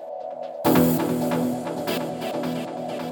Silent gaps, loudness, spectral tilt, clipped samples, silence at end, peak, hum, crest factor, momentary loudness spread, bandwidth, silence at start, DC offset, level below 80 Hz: none; -25 LUFS; -6 dB/octave; under 0.1%; 0 s; -8 dBFS; none; 18 dB; 12 LU; over 20 kHz; 0 s; under 0.1%; -58 dBFS